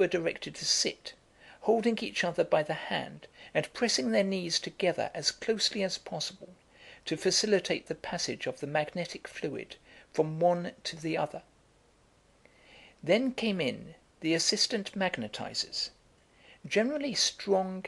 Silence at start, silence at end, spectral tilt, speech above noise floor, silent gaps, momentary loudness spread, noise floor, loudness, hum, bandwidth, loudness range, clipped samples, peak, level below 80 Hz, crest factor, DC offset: 0 s; 0 s; -3 dB/octave; 34 dB; none; 11 LU; -65 dBFS; -31 LUFS; none; 12.5 kHz; 4 LU; under 0.1%; -12 dBFS; -68 dBFS; 20 dB; under 0.1%